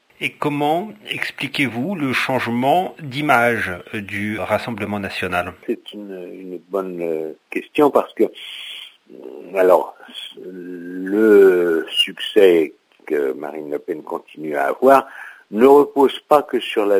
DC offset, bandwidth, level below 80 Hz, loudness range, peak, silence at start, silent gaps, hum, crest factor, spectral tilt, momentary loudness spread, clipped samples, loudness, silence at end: under 0.1%; 16 kHz; -56 dBFS; 7 LU; 0 dBFS; 0.2 s; none; none; 18 dB; -5.5 dB/octave; 19 LU; under 0.1%; -18 LUFS; 0 s